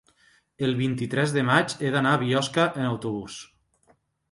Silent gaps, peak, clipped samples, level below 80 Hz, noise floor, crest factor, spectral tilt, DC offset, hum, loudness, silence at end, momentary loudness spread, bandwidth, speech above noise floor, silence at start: none; -6 dBFS; under 0.1%; -62 dBFS; -64 dBFS; 20 dB; -5.5 dB/octave; under 0.1%; none; -24 LUFS; 0.85 s; 10 LU; 11.5 kHz; 40 dB; 0.6 s